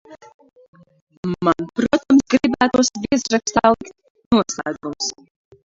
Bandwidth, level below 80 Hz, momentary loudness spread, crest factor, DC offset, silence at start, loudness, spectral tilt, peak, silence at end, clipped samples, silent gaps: 7.8 kHz; -50 dBFS; 11 LU; 20 dB; under 0.1%; 0.1 s; -19 LUFS; -4 dB/octave; 0 dBFS; 0.55 s; under 0.1%; 0.34-0.39 s, 0.68-0.73 s, 1.01-1.07 s, 1.17-1.23 s, 4.10-4.15 s, 4.26-4.31 s